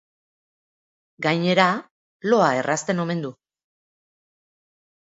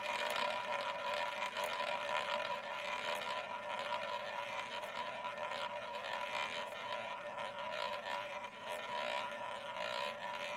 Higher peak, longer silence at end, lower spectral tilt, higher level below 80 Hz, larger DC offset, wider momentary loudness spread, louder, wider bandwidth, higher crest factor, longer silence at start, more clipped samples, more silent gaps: first, -2 dBFS vs -22 dBFS; first, 1.7 s vs 0 s; first, -5 dB/octave vs -1.5 dB/octave; first, -72 dBFS vs -78 dBFS; neither; first, 11 LU vs 6 LU; first, -22 LUFS vs -41 LUFS; second, 8 kHz vs 16 kHz; about the same, 24 dB vs 20 dB; first, 1.2 s vs 0 s; neither; first, 1.91-2.20 s vs none